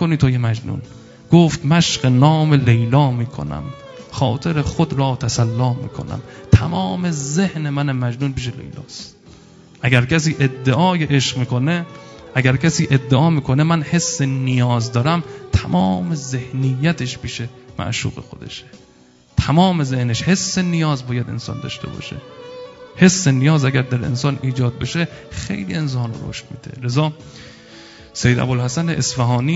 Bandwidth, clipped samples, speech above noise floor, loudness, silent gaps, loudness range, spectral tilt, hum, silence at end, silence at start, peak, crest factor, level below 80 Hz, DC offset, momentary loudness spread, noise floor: 8 kHz; under 0.1%; 32 dB; -18 LUFS; none; 6 LU; -5.5 dB/octave; none; 0 s; 0 s; 0 dBFS; 18 dB; -40 dBFS; under 0.1%; 17 LU; -50 dBFS